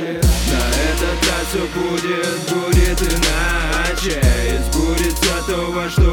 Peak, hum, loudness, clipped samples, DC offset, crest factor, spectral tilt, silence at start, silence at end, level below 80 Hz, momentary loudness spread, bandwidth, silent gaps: -2 dBFS; none; -18 LUFS; under 0.1%; under 0.1%; 14 dB; -4 dB/octave; 0 s; 0 s; -20 dBFS; 4 LU; 18.5 kHz; none